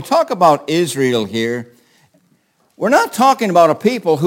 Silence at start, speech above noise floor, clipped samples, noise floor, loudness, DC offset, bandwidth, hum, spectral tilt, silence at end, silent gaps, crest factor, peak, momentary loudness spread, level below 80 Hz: 0 s; 45 dB; under 0.1%; -59 dBFS; -14 LUFS; under 0.1%; 17 kHz; none; -5 dB/octave; 0 s; none; 16 dB; 0 dBFS; 8 LU; -64 dBFS